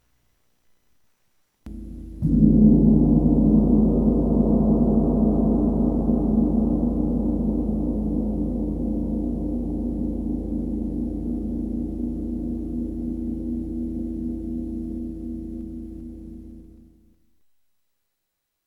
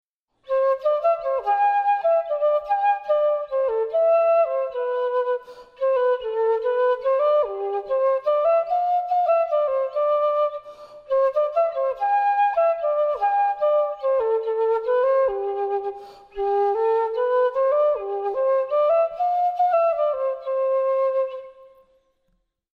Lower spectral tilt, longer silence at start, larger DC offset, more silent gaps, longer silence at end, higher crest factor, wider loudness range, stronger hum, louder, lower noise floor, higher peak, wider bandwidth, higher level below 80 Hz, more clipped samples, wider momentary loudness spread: first, -12.5 dB/octave vs -4.5 dB/octave; first, 1.65 s vs 0.5 s; neither; neither; first, 2 s vs 1.1 s; first, 20 dB vs 12 dB; first, 15 LU vs 2 LU; neither; about the same, -23 LUFS vs -22 LUFS; first, -79 dBFS vs -70 dBFS; first, -4 dBFS vs -10 dBFS; second, 1.4 kHz vs 5.2 kHz; first, -30 dBFS vs -62 dBFS; neither; first, 16 LU vs 6 LU